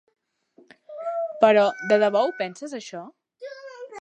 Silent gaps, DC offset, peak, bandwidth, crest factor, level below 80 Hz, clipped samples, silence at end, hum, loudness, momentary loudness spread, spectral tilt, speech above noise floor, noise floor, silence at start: none; under 0.1%; -4 dBFS; 9 kHz; 22 dB; -80 dBFS; under 0.1%; 0 s; none; -21 LUFS; 22 LU; -4.5 dB/octave; 37 dB; -59 dBFS; 0.9 s